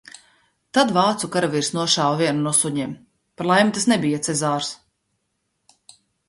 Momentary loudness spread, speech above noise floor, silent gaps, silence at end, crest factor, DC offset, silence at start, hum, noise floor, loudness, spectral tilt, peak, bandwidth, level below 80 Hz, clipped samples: 11 LU; 53 dB; none; 1.55 s; 20 dB; under 0.1%; 0.75 s; none; -73 dBFS; -20 LUFS; -3.5 dB/octave; -2 dBFS; 11.5 kHz; -64 dBFS; under 0.1%